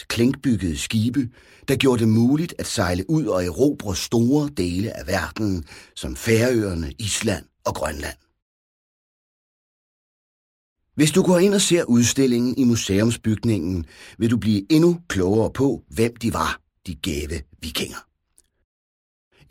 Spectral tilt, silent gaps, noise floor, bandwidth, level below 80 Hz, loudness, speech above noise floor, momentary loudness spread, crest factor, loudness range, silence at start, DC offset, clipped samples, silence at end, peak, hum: -5 dB/octave; 8.42-10.76 s; -63 dBFS; 16.5 kHz; -44 dBFS; -21 LUFS; 42 dB; 13 LU; 18 dB; 10 LU; 0 s; under 0.1%; under 0.1%; 1.5 s; -4 dBFS; none